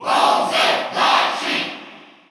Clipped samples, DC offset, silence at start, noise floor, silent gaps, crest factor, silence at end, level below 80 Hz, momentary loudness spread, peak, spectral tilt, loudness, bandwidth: under 0.1%; under 0.1%; 0 s; -41 dBFS; none; 16 dB; 0.3 s; -82 dBFS; 9 LU; -2 dBFS; -1.5 dB/octave; -17 LUFS; 15.5 kHz